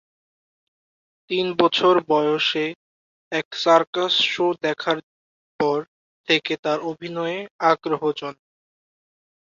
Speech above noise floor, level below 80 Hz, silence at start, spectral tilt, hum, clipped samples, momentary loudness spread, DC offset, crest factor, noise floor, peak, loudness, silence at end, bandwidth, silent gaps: over 69 dB; -70 dBFS; 1.3 s; -4.5 dB/octave; none; under 0.1%; 10 LU; under 0.1%; 20 dB; under -90 dBFS; -2 dBFS; -21 LUFS; 1.1 s; 7.4 kHz; 2.75-3.31 s, 3.45-3.51 s, 3.87-3.93 s, 5.03-5.59 s, 5.88-6.24 s, 6.59-6.63 s, 7.51-7.59 s